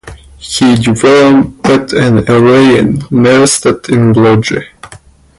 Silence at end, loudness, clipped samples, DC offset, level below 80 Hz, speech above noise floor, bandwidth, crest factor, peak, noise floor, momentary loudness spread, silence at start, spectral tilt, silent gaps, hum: 0.45 s; -8 LUFS; under 0.1%; under 0.1%; -36 dBFS; 30 dB; 11.5 kHz; 8 dB; 0 dBFS; -37 dBFS; 6 LU; 0.05 s; -5.5 dB/octave; none; none